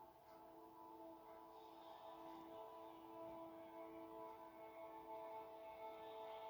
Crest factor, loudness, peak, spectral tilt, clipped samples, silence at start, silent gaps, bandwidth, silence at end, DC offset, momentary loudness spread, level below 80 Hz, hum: 14 dB; -58 LUFS; -44 dBFS; -5.5 dB/octave; under 0.1%; 0 s; none; over 20 kHz; 0 s; under 0.1%; 6 LU; -86 dBFS; none